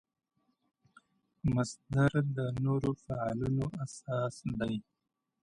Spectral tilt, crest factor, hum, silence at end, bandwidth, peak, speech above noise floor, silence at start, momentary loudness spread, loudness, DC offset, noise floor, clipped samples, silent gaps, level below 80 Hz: -7.5 dB/octave; 18 dB; none; 0.6 s; 10.5 kHz; -16 dBFS; 34 dB; 1.45 s; 8 LU; -34 LUFS; under 0.1%; -66 dBFS; under 0.1%; none; -56 dBFS